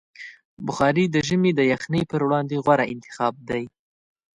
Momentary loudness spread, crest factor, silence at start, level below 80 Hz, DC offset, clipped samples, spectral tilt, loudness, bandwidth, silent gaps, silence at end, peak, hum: 16 LU; 18 dB; 0.2 s; -56 dBFS; under 0.1%; under 0.1%; -6 dB/octave; -22 LUFS; 11 kHz; 0.45-0.57 s; 0.65 s; -4 dBFS; none